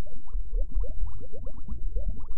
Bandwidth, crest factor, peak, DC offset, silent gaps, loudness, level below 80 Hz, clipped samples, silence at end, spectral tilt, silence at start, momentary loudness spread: 1.3 kHz; 10 dB; -12 dBFS; 9%; none; -38 LUFS; -30 dBFS; under 0.1%; 0 s; -12 dB/octave; 0 s; 9 LU